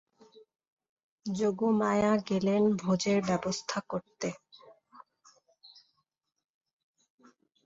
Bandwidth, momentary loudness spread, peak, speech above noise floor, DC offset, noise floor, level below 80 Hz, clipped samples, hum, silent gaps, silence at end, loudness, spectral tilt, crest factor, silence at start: 8 kHz; 11 LU; -14 dBFS; 51 dB; under 0.1%; -80 dBFS; -68 dBFS; under 0.1%; none; none; 2 s; -30 LUFS; -5.5 dB/octave; 20 dB; 1.25 s